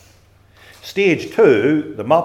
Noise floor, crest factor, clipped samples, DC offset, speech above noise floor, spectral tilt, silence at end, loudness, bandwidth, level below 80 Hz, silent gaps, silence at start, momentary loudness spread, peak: -50 dBFS; 16 dB; under 0.1%; under 0.1%; 35 dB; -6.5 dB/octave; 0 s; -16 LUFS; 13.5 kHz; -58 dBFS; none; 0.85 s; 12 LU; 0 dBFS